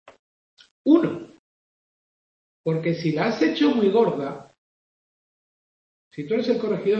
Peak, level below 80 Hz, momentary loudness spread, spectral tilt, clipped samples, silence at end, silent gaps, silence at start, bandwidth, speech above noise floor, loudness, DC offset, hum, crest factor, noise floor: -4 dBFS; -70 dBFS; 16 LU; -7.5 dB/octave; under 0.1%; 0 s; 0.19-0.57 s, 0.71-0.85 s, 1.39-2.64 s, 4.58-6.11 s; 0.05 s; 7.4 kHz; over 69 dB; -22 LUFS; under 0.1%; none; 20 dB; under -90 dBFS